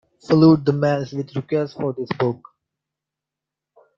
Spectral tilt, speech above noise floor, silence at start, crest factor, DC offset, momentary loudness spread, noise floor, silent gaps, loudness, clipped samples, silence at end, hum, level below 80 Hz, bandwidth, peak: -8.5 dB/octave; 67 dB; 0.3 s; 20 dB; under 0.1%; 13 LU; -86 dBFS; none; -20 LUFS; under 0.1%; 1.6 s; none; -58 dBFS; 7.2 kHz; -2 dBFS